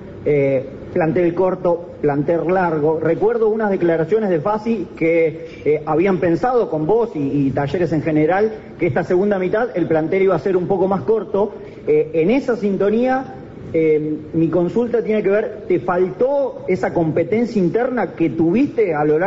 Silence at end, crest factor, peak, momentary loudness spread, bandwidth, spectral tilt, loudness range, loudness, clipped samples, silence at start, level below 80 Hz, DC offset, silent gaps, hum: 0 s; 10 dB; -8 dBFS; 4 LU; 7.6 kHz; -7.5 dB/octave; 1 LU; -18 LUFS; under 0.1%; 0 s; -48 dBFS; under 0.1%; none; none